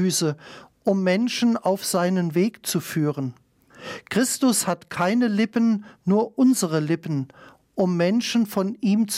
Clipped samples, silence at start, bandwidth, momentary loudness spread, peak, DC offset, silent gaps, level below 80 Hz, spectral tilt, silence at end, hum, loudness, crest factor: under 0.1%; 0 s; 16 kHz; 9 LU; -8 dBFS; under 0.1%; none; -70 dBFS; -5 dB/octave; 0 s; none; -23 LUFS; 14 dB